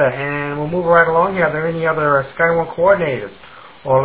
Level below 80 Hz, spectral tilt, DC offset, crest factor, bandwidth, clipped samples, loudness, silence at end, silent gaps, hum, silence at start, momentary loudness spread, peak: -48 dBFS; -10 dB/octave; 0.3%; 16 dB; 4 kHz; under 0.1%; -16 LUFS; 0 s; none; none; 0 s; 9 LU; 0 dBFS